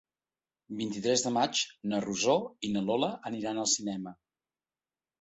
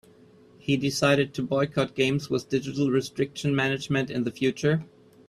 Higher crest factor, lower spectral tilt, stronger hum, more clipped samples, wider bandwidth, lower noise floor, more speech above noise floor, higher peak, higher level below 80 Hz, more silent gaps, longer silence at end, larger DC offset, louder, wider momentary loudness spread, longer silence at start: about the same, 20 dB vs 18 dB; second, -3 dB/octave vs -5.5 dB/octave; neither; neither; second, 8.4 kHz vs 13.5 kHz; first, under -90 dBFS vs -54 dBFS; first, over 59 dB vs 29 dB; second, -12 dBFS vs -8 dBFS; second, -72 dBFS vs -60 dBFS; neither; first, 1.1 s vs 0.45 s; neither; second, -31 LUFS vs -26 LUFS; first, 10 LU vs 6 LU; about the same, 0.7 s vs 0.65 s